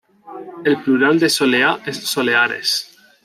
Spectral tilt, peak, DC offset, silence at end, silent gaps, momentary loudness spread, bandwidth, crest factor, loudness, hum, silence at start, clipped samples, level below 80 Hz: -3 dB/octave; -2 dBFS; under 0.1%; 0.4 s; none; 9 LU; 15.5 kHz; 16 dB; -16 LUFS; none; 0.25 s; under 0.1%; -66 dBFS